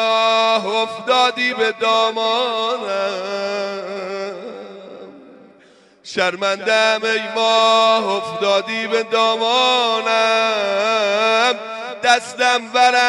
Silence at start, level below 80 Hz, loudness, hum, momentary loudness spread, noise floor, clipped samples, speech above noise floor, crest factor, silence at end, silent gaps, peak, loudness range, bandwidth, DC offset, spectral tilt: 0 s; -76 dBFS; -17 LUFS; none; 12 LU; -50 dBFS; under 0.1%; 33 dB; 18 dB; 0 s; none; 0 dBFS; 9 LU; 11.5 kHz; under 0.1%; -2 dB/octave